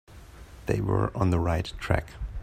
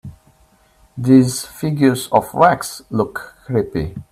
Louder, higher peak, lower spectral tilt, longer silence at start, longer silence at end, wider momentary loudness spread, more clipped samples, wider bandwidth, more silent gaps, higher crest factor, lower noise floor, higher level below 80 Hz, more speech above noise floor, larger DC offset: second, -28 LUFS vs -17 LUFS; second, -6 dBFS vs 0 dBFS; first, -7.5 dB/octave vs -6 dB/octave; about the same, 0.1 s vs 0.05 s; about the same, 0 s vs 0.1 s; first, 15 LU vs 12 LU; neither; about the same, 14.5 kHz vs 15 kHz; neither; about the same, 20 dB vs 18 dB; second, -47 dBFS vs -54 dBFS; first, -40 dBFS vs -46 dBFS; second, 20 dB vs 38 dB; neither